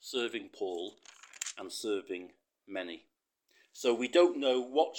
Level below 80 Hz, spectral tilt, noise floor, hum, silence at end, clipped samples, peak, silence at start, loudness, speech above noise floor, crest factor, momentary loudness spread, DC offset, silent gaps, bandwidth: -90 dBFS; -2 dB/octave; -72 dBFS; none; 0 s; under 0.1%; -12 dBFS; 0.05 s; -33 LUFS; 40 dB; 22 dB; 17 LU; under 0.1%; none; 18 kHz